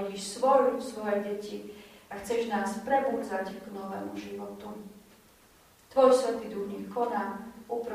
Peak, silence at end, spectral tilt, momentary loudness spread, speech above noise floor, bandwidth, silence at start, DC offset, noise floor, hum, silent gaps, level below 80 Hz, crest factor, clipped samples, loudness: -8 dBFS; 0 s; -4.5 dB/octave; 19 LU; 30 dB; 15.5 kHz; 0 s; under 0.1%; -59 dBFS; none; none; -66 dBFS; 22 dB; under 0.1%; -30 LUFS